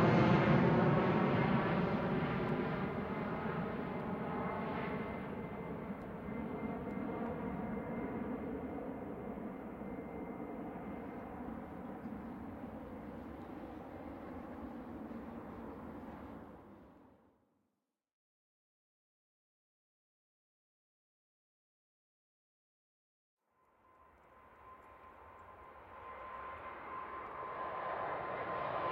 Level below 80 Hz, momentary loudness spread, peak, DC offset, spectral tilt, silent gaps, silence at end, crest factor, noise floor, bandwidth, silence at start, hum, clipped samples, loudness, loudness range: -62 dBFS; 19 LU; -18 dBFS; under 0.1%; -9 dB/octave; 18.13-23.37 s; 0 s; 22 dB; -87 dBFS; 16 kHz; 0 s; none; under 0.1%; -39 LUFS; 18 LU